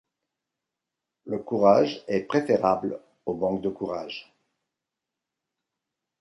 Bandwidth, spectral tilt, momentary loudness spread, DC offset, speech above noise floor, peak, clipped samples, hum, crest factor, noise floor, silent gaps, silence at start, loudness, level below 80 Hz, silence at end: 11 kHz; -7 dB/octave; 15 LU; under 0.1%; 62 dB; -6 dBFS; under 0.1%; none; 22 dB; -87 dBFS; none; 1.25 s; -25 LUFS; -64 dBFS; 2 s